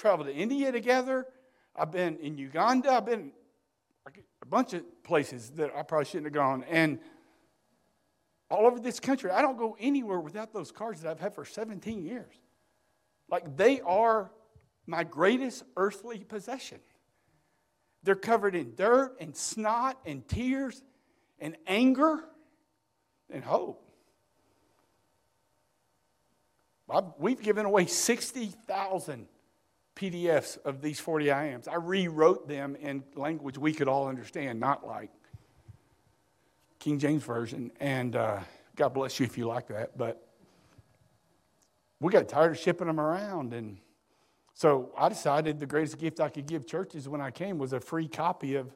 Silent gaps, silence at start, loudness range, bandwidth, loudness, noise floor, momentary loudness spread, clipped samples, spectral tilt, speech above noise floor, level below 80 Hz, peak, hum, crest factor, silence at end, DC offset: none; 0 s; 6 LU; 15.5 kHz; -30 LUFS; -77 dBFS; 14 LU; under 0.1%; -5 dB/octave; 47 dB; -64 dBFS; -8 dBFS; none; 24 dB; 0.05 s; under 0.1%